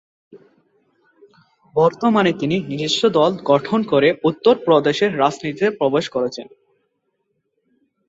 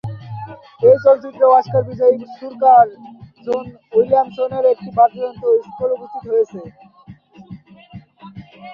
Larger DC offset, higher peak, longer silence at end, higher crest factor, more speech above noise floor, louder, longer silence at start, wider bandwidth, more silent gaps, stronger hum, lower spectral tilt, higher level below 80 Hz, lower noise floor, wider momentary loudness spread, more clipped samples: neither; about the same, -2 dBFS vs -2 dBFS; first, 1.65 s vs 0 s; about the same, 18 dB vs 16 dB; first, 54 dB vs 28 dB; about the same, -18 LUFS vs -16 LUFS; first, 0.35 s vs 0.05 s; first, 8 kHz vs 5.8 kHz; neither; neither; second, -5.5 dB/octave vs -8.5 dB/octave; second, -62 dBFS vs -56 dBFS; first, -71 dBFS vs -43 dBFS; second, 7 LU vs 20 LU; neither